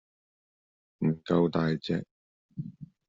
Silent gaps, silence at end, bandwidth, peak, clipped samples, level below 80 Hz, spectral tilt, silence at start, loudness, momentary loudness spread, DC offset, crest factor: 2.11-2.49 s; 0.25 s; 7.4 kHz; -12 dBFS; under 0.1%; -64 dBFS; -7 dB/octave; 1 s; -29 LUFS; 16 LU; under 0.1%; 20 dB